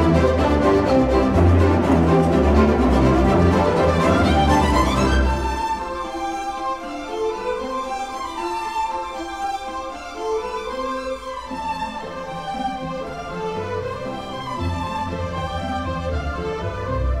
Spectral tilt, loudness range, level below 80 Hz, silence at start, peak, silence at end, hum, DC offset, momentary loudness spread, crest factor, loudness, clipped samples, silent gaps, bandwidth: -7 dB/octave; 11 LU; -28 dBFS; 0 s; -4 dBFS; 0 s; none; 0.3%; 12 LU; 16 dB; -21 LUFS; under 0.1%; none; 13 kHz